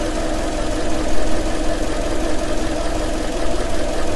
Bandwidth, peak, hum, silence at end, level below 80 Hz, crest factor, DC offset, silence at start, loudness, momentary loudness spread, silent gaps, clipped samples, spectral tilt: 12 kHz; -2 dBFS; none; 0 s; -24 dBFS; 14 dB; under 0.1%; 0 s; -23 LUFS; 1 LU; none; under 0.1%; -4.5 dB/octave